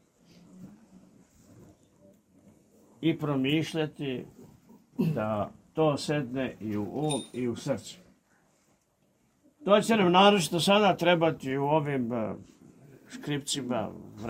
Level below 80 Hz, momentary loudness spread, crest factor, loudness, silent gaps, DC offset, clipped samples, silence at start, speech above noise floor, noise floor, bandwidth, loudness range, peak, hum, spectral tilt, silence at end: -66 dBFS; 15 LU; 22 dB; -28 LUFS; none; under 0.1%; under 0.1%; 0.55 s; 43 dB; -70 dBFS; 16 kHz; 10 LU; -8 dBFS; none; -5 dB/octave; 0 s